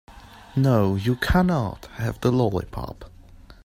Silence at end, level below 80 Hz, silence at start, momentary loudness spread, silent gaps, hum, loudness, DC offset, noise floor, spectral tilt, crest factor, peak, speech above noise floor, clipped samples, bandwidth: 0.45 s; -38 dBFS; 0.1 s; 14 LU; none; none; -23 LUFS; under 0.1%; -46 dBFS; -7.5 dB/octave; 16 dB; -8 dBFS; 24 dB; under 0.1%; 16 kHz